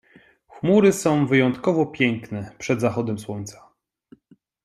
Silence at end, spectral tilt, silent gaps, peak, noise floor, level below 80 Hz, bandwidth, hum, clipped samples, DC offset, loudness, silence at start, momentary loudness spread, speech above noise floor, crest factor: 1.15 s; -6 dB/octave; none; -4 dBFS; -58 dBFS; -62 dBFS; 14 kHz; none; under 0.1%; under 0.1%; -21 LUFS; 0.55 s; 16 LU; 37 dB; 18 dB